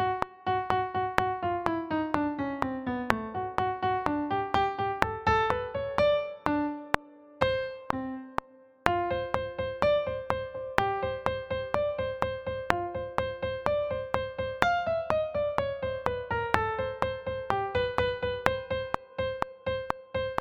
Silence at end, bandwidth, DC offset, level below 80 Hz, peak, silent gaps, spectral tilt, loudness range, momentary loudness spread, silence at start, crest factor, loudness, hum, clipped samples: 0 s; 15.5 kHz; under 0.1%; -50 dBFS; 0 dBFS; none; -6 dB/octave; 3 LU; 7 LU; 0 s; 30 dB; -30 LUFS; none; under 0.1%